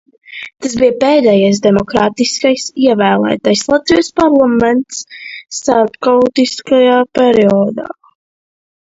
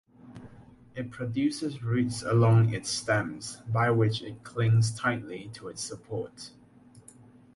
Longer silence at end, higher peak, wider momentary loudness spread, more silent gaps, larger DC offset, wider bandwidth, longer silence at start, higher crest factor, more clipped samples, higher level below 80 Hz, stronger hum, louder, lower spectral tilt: first, 1.05 s vs 0.55 s; first, 0 dBFS vs -12 dBFS; second, 14 LU vs 17 LU; neither; neither; second, 8 kHz vs 11.5 kHz; about the same, 0.3 s vs 0.25 s; second, 12 dB vs 18 dB; neither; first, -46 dBFS vs -58 dBFS; neither; first, -11 LUFS vs -28 LUFS; second, -4.5 dB/octave vs -6 dB/octave